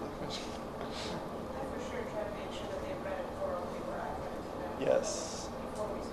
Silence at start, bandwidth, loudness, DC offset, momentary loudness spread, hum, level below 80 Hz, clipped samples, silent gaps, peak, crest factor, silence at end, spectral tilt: 0 s; 13 kHz; -38 LUFS; under 0.1%; 9 LU; none; -54 dBFS; under 0.1%; none; -18 dBFS; 20 dB; 0 s; -4.5 dB/octave